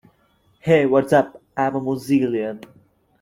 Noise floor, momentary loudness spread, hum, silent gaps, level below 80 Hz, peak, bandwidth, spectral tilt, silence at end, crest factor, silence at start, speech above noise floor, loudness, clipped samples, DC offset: -61 dBFS; 13 LU; none; none; -58 dBFS; -4 dBFS; 16 kHz; -7 dB/octave; 0.65 s; 18 dB; 0.65 s; 42 dB; -20 LUFS; under 0.1%; under 0.1%